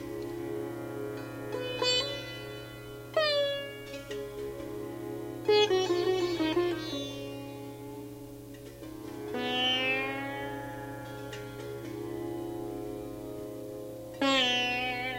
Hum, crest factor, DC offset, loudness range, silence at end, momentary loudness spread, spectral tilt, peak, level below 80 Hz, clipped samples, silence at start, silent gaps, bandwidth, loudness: 60 Hz at -50 dBFS; 20 dB; under 0.1%; 8 LU; 0 s; 16 LU; -4 dB/octave; -12 dBFS; -60 dBFS; under 0.1%; 0 s; none; 16 kHz; -32 LUFS